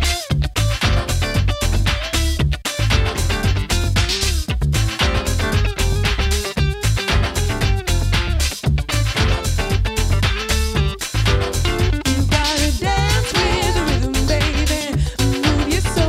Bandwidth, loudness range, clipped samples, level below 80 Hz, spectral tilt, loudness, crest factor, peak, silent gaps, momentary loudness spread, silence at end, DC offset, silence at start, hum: 16 kHz; 1 LU; under 0.1%; -22 dBFS; -4.5 dB/octave; -19 LUFS; 16 dB; -2 dBFS; none; 3 LU; 0 s; under 0.1%; 0 s; none